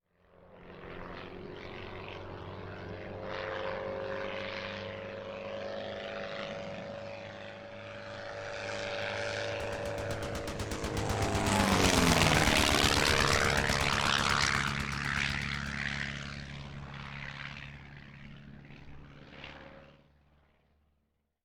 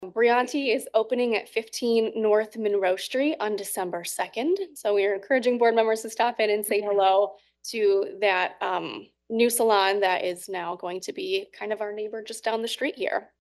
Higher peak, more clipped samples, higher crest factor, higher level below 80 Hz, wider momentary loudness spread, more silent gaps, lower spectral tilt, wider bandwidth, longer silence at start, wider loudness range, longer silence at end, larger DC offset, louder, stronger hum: second, -12 dBFS vs -8 dBFS; neither; first, 22 dB vs 16 dB; first, -46 dBFS vs -78 dBFS; first, 22 LU vs 11 LU; neither; about the same, -3.5 dB/octave vs -2.5 dB/octave; first, over 20 kHz vs 12.5 kHz; first, 0.4 s vs 0 s; first, 19 LU vs 3 LU; first, 1.5 s vs 0.15 s; neither; second, -31 LUFS vs -25 LUFS; neither